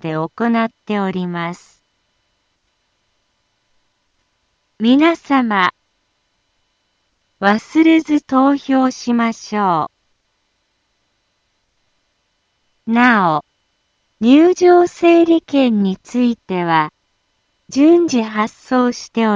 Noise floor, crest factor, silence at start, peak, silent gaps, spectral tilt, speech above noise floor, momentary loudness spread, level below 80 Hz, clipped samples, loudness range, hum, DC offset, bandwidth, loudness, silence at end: -66 dBFS; 16 dB; 0.05 s; 0 dBFS; none; -6 dB/octave; 52 dB; 10 LU; -62 dBFS; under 0.1%; 12 LU; none; under 0.1%; 7.6 kHz; -15 LUFS; 0 s